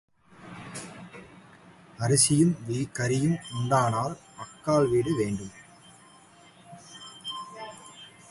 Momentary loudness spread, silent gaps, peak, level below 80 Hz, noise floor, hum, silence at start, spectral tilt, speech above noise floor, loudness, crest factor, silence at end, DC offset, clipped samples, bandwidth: 24 LU; none; -8 dBFS; -60 dBFS; -54 dBFS; none; 0.4 s; -5 dB/octave; 29 dB; -26 LUFS; 20 dB; 0.2 s; under 0.1%; under 0.1%; 11.5 kHz